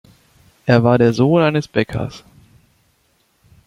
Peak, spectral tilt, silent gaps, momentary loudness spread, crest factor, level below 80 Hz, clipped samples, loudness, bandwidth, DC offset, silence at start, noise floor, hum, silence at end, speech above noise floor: -2 dBFS; -7.5 dB/octave; none; 13 LU; 18 dB; -50 dBFS; under 0.1%; -16 LUFS; 11 kHz; under 0.1%; 0.65 s; -61 dBFS; none; 1.5 s; 46 dB